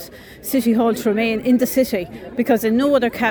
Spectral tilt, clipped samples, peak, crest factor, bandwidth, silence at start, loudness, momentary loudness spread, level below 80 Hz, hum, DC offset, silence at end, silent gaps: -5 dB/octave; under 0.1%; -4 dBFS; 14 dB; over 20 kHz; 0 s; -18 LUFS; 9 LU; -50 dBFS; none; under 0.1%; 0 s; none